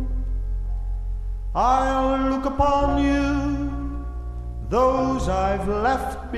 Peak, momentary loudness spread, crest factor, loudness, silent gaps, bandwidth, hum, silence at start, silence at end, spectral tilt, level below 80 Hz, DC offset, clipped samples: -8 dBFS; 12 LU; 16 dB; -23 LUFS; none; 12.5 kHz; none; 0 s; 0 s; -7 dB/octave; -28 dBFS; under 0.1%; under 0.1%